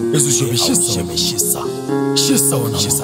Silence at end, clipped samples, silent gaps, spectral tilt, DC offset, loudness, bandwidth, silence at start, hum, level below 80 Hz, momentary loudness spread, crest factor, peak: 0 s; under 0.1%; none; -3.5 dB/octave; under 0.1%; -15 LUFS; 16.5 kHz; 0 s; none; -46 dBFS; 5 LU; 16 dB; 0 dBFS